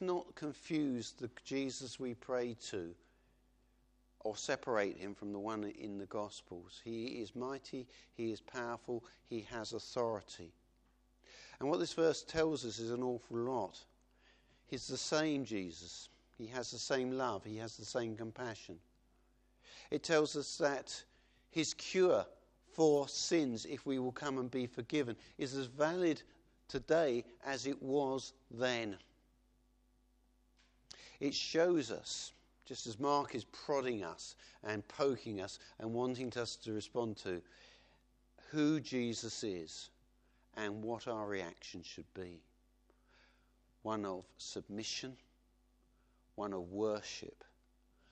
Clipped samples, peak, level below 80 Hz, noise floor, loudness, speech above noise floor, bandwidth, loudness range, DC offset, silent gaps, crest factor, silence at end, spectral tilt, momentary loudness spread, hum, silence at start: under 0.1%; -18 dBFS; -72 dBFS; -73 dBFS; -40 LUFS; 34 dB; 9.8 kHz; 8 LU; under 0.1%; none; 22 dB; 0.8 s; -4.5 dB/octave; 16 LU; none; 0 s